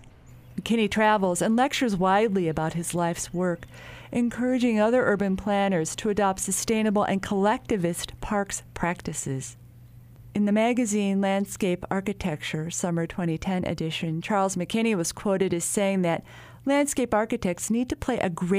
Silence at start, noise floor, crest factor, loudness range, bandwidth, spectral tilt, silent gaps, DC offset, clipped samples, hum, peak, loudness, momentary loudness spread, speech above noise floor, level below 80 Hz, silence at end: 0 s; -48 dBFS; 16 dB; 4 LU; 15.5 kHz; -5 dB/octave; none; under 0.1%; under 0.1%; none; -10 dBFS; -26 LUFS; 8 LU; 23 dB; -50 dBFS; 0 s